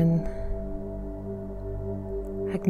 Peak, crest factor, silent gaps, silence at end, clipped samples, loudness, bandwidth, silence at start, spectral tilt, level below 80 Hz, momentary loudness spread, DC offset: -12 dBFS; 18 dB; none; 0 s; under 0.1%; -33 LUFS; 4.6 kHz; 0 s; -10 dB/octave; -36 dBFS; 7 LU; under 0.1%